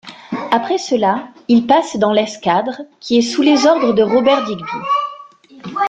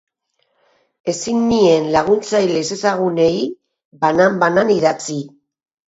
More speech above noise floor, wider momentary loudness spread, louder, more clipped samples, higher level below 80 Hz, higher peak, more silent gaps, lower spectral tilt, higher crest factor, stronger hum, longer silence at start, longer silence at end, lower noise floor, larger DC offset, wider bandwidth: second, 25 dB vs 52 dB; about the same, 14 LU vs 12 LU; about the same, -15 LUFS vs -16 LUFS; neither; about the same, -58 dBFS vs -54 dBFS; about the same, -2 dBFS vs 0 dBFS; second, none vs 3.85-3.91 s; about the same, -4.5 dB/octave vs -5 dB/octave; about the same, 14 dB vs 16 dB; neither; second, 0.05 s vs 1.05 s; second, 0 s vs 0.65 s; second, -40 dBFS vs -67 dBFS; neither; first, 9.2 kHz vs 8 kHz